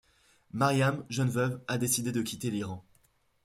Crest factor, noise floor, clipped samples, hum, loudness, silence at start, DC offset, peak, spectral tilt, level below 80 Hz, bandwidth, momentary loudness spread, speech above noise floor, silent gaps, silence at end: 18 dB; -69 dBFS; under 0.1%; none; -30 LUFS; 0.55 s; under 0.1%; -14 dBFS; -5 dB/octave; -66 dBFS; 16 kHz; 12 LU; 39 dB; none; 0.65 s